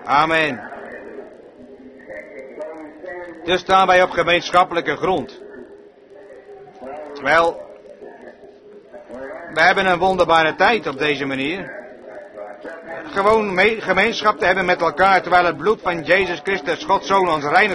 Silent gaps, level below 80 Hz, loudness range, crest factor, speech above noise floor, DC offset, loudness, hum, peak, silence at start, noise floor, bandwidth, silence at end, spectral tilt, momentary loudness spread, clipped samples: none; -50 dBFS; 8 LU; 18 dB; 26 dB; under 0.1%; -17 LUFS; none; 0 dBFS; 0 s; -43 dBFS; 11 kHz; 0 s; -4.5 dB/octave; 21 LU; under 0.1%